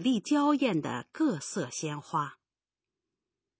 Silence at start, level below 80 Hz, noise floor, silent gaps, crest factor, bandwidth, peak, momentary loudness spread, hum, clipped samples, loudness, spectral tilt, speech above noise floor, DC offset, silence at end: 0 s; -78 dBFS; under -90 dBFS; none; 16 dB; 8 kHz; -16 dBFS; 9 LU; none; under 0.1%; -30 LUFS; -5 dB/octave; over 60 dB; under 0.1%; 1.25 s